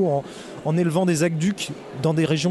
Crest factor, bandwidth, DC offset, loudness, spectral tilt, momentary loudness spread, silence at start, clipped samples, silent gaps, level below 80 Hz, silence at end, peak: 14 dB; 12 kHz; under 0.1%; -23 LUFS; -6 dB/octave; 10 LU; 0 s; under 0.1%; none; -60 dBFS; 0 s; -8 dBFS